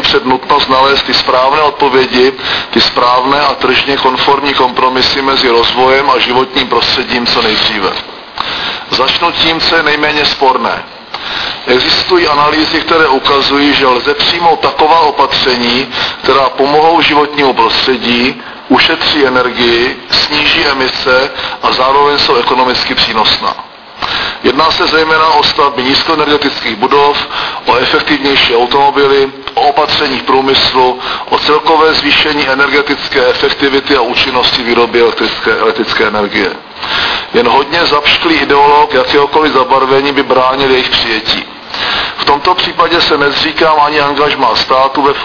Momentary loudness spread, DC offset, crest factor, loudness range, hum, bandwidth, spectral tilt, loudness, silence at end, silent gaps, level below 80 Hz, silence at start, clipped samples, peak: 6 LU; 0.2%; 10 dB; 2 LU; none; 5.4 kHz; -4 dB/octave; -8 LUFS; 0 s; none; -38 dBFS; 0 s; 0.7%; 0 dBFS